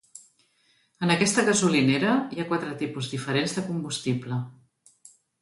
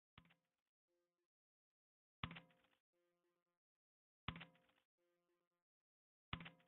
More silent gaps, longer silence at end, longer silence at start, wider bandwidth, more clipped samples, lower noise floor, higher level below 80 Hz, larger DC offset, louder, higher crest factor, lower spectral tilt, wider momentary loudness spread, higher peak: second, none vs 0.62-0.88 s, 1.25-2.23 s, 2.80-2.93 s, 3.42-3.46 s, 3.57-4.28 s, 4.85-4.98 s, 5.47-5.51 s, 5.62-6.32 s; first, 0.9 s vs 0.05 s; about the same, 0.15 s vs 0.15 s; first, 11.5 kHz vs 4 kHz; neither; second, -66 dBFS vs -88 dBFS; first, -66 dBFS vs -74 dBFS; neither; first, -25 LUFS vs -56 LUFS; second, 20 dB vs 32 dB; first, -4.5 dB/octave vs -3 dB/octave; first, 11 LU vs 7 LU; first, -8 dBFS vs -30 dBFS